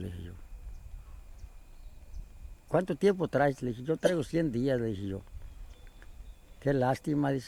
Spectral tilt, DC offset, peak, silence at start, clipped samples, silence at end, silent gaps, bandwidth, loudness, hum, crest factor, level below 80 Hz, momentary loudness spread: -7 dB/octave; under 0.1%; -12 dBFS; 0 s; under 0.1%; 0 s; none; 17 kHz; -31 LUFS; none; 20 dB; -48 dBFS; 24 LU